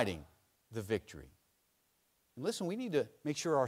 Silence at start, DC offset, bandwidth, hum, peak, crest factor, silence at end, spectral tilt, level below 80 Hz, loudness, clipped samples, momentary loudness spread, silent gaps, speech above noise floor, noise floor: 0 s; under 0.1%; 16 kHz; none; -16 dBFS; 22 dB; 0 s; -5 dB/octave; -66 dBFS; -38 LUFS; under 0.1%; 17 LU; none; 40 dB; -77 dBFS